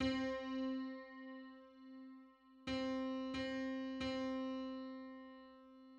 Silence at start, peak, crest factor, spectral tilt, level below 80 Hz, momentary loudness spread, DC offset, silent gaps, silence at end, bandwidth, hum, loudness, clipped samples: 0 s; -26 dBFS; 18 dB; -5.5 dB/octave; -68 dBFS; 17 LU; under 0.1%; none; 0 s; 8 kHz; none; -44 LUFS; under 0.1%